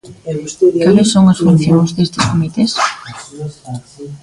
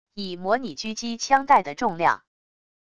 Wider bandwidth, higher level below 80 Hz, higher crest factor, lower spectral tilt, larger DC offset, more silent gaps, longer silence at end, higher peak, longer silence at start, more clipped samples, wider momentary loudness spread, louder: first, 11.5 kHz vs 10 kHz; first, -44 dBFS vs -60 dBFS; second, 12 dB vs 20 dB; first, -6 dB/octave vs -3.5 dB/octave; second, under 0.1% vs 0.5%; neither; second, 0.05 s vs 0.7 s; first, 0 dBFS vs -4 dBFS; about the same, 0.05 s vs 0.05 s; neither; first, 19 LU vs 13 LU; first, -12 LUFS vs -23 LUFS